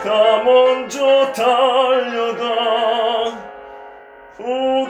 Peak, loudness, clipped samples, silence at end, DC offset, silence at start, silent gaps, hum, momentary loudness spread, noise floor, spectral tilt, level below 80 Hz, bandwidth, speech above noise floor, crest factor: -2 dBFS; -16 LUFS; under 0.1%; 0 s; under 0.1%; 0 s; none; none; 17 LU; -40 dBFS; -2.5 dB/octave; -60 dBFS; 13 kHz; 26 dB; 14 dB